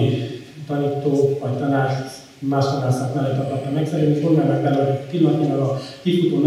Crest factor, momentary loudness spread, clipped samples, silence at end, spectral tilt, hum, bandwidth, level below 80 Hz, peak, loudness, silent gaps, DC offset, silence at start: 16 dB; 8 LU; under 0.1%; 0 s; -8 dB/octave; none; 13 kHz; -64 dBFS; -4 dBFS; -20 LUFS; none; under 0.1%; 0 s